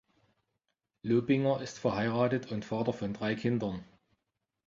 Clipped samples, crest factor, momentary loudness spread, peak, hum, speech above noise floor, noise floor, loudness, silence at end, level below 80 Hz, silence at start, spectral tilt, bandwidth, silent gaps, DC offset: under 0.1%; 18 dB; 8 LU; -14 dBFS; none; 55 dB; -86 dBFS; -32 LUFS; 0.8 s; -64 dBFS; 1.05 s; -7 dB/octave; 7.6 kHz; none; under 0.1%